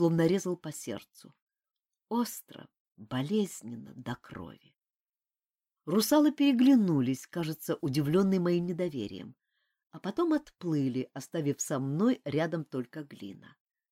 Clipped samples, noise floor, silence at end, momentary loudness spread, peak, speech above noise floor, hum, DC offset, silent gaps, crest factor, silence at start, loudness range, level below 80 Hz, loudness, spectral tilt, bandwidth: under 0.1%; under -90 dBFS; 0.55 s; 19 LU; -14 dBFS; over 60 dB; none; under 0.1%; 1.42-1.47 s, 2.80-2.85 s, 4.96-5.13 s; 18 dB; 0 s; 10 LU; -70 dBFS; -30 LUFS; -6 dB/octave; 16.5 kHz